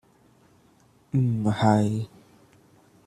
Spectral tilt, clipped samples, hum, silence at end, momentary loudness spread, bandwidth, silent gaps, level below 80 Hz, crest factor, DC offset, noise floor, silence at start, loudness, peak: -7.5 dB/octave; under 0.1%; none; 1 s; 11 LU; 11.5 kHz; none; -60 dBFS; 22 dB; under 0.1%; -60 dBFS; 1.15 s; -24 LUFS; -6 dBFS